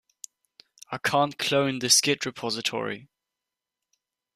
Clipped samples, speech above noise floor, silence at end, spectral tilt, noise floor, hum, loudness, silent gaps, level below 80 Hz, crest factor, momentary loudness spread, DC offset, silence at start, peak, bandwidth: under 0.1%; 62 dB; 1.3 s; -2 dB/octave; -87 dBFS; none; -24 LUFS; none; -70 dBFS; 22 dB; 22 LU; under 0.1%; 0.9 s; -6 dBFS; 15 kHz